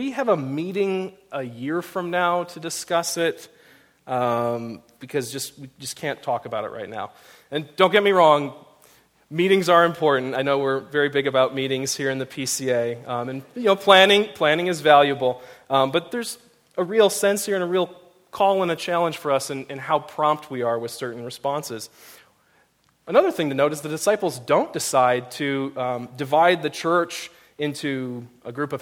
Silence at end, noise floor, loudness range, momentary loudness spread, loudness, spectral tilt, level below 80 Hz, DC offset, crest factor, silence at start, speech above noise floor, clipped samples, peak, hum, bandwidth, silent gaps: 0 s; -63 dBFS; 8 LU; 16 LU; -22 LUFS; -4 dB/octave; -70 dBFS; under 0.1%; 22 dB; 0 s; 41 dB; under 0.1%; 0 dBFS; none; 17 kHz; none